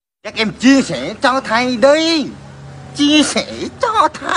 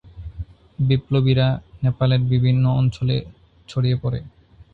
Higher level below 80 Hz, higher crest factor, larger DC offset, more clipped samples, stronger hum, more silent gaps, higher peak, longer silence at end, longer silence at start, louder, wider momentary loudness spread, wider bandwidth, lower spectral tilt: second, -48 dBFS vs -42 dBFS; about the same, 14 dB vs 16 dB; neither; neither; neither; neither; first, 0 dBFS vs -6 dBFS; second, 0 s vs 0.45 s; first, 0.25 s vs 0.05 s; first, -14 LUFS vs -20 LUFS; about the same, 15 LU vs 17 LU; first, 11 kHz vs 4.8 kHz; second, -3.5 dB/octave vs -8.5 dB/octave